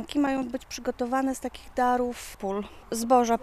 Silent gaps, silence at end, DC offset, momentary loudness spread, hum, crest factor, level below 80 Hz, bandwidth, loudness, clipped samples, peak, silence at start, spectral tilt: none; 0 s; under 0.1%; 11 LU; none; 18 dB; -52 dBFS; 15 kHz; -28 LUFS; under 0.1%; -8 dBFS; 0 s; -4 dB/octave